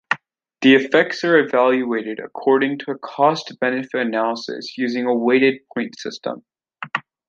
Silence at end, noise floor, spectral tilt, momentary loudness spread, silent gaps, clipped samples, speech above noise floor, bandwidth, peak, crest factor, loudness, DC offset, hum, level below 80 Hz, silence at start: 0.3 s; -40 dBFS; -5 dB/octave; 14 LU; none; under 0.1%; 21 dB; 7.4 kHz; -2 dBFS; 18 dB; -19 LUFS; under 0.1%; none; -70 dBFS; 0.1 s